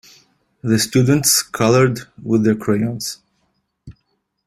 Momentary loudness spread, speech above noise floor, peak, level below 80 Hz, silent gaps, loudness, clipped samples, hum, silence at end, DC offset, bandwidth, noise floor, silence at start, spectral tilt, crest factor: 14 LU; 53 dB; -2 dBFS; -52 dBFS; none; -17 LUFS; under 0.1%; none; 0.55 s; under 0.1%; 15 kHz; -69 dBFS; 0.65 s; -4.5 dB/octave; 18 dB